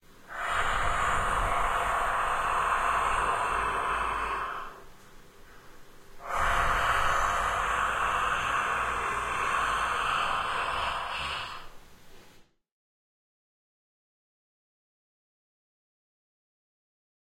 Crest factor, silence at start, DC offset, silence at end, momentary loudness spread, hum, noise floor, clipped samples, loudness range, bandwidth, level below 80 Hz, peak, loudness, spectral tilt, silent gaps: 18 dB; 0.1 s; under 0.1%; 4.9 s; 8 LU; none; -57 dBFS; under 0.1%; 7 LU; 16 kHz; -44 dBFS; -12 dBFS; -28 LUFS; -2.5 dB/octave; none